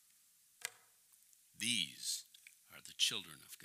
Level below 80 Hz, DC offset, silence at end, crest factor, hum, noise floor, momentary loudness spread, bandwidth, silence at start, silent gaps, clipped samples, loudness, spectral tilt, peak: -90 dBFS; under 0.1%; 0 s; 26 dB; none; -70 dBFS; 22 LU; 16 kHz; 0.6 s; none; under 0.1%; -39 LUFS; 0 dB/octave; -20 dBFS